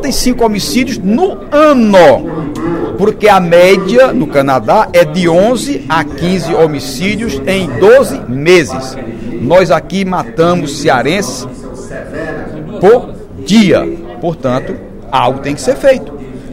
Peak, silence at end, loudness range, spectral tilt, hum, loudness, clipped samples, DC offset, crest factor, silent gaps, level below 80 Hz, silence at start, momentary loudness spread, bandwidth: 0 dBFS; 0 s; 5 LU; -5.5 dB/octave; none; -10 LUFS; 1%; under 0.1%; 10 dB; none; -30 dBFS; 0 s; 16 LU; 16.5 kHz